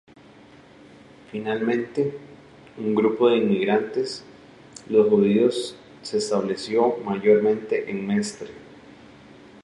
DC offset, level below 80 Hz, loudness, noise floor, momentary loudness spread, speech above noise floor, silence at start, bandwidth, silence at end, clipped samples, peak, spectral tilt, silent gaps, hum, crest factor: under 0.1%; -66 dBFS; -22 LUFS; -49 dBFS; 18 LU; 27 dB; 1.35 s; 11.5 kHz; 0.85 s; under 0.1%; -6 dBFS; -6 dB/octave; none; none; 18 dB